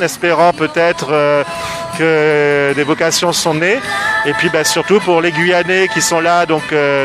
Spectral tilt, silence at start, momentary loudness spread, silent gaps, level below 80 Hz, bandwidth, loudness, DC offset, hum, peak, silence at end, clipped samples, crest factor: -3.5 dB/octave; 0 s; 3 LU; none; -50 dBFS; 15.5 kHz; -13 LUFS; under 0.1%; none; 0 dBFS; 0 s; under 0.1%; 12 dB